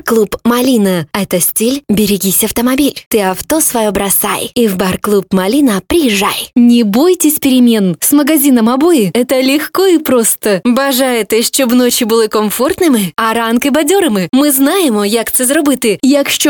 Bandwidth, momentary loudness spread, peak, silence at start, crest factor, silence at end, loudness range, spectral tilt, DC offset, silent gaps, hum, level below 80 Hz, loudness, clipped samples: 19 kHz; 4 LU; 0 dBFS; 0.05 s; 10 dB; 0 s; 2 LU; -3.5 dB/octave; 0.1%; 3.06-3.11 s; none; -42 dBFS; -10 LUFS; under 0.1%